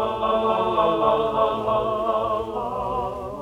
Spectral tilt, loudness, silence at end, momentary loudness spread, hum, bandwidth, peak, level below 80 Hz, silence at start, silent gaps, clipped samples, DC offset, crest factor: -6.5 dB/octave; -23 LUFS; 0 s; 7 LU; none; 12 kHz; -6 dBFS; -46 dBFS; 0 s; none; under 0.1%; under 0.1%; 16 dB